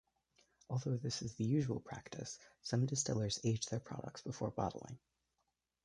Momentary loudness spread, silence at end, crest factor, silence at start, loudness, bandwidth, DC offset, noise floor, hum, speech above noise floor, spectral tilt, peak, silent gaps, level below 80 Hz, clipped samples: 12 LU; 0.85 s; 18 dB; 0.7 s; -40 LUFS; 11 kHz; under 0.1%; -86 dBFS; none; 46 dB; -5 dB/octave; -22 dBFS; none; -66 dBFS; under 0.1%